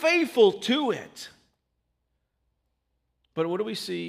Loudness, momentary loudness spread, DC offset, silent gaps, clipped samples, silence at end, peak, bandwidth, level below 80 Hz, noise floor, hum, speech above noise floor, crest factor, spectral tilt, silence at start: -25 LUFS; 21 LU; under 0.1%; none; under 0.1%; 0 s; -6 dBFS; 15.5 kHz; -74 dBFS; -77 dBFS; none; 52 dB; 20 dB; -4.5 dB/octave; 0 s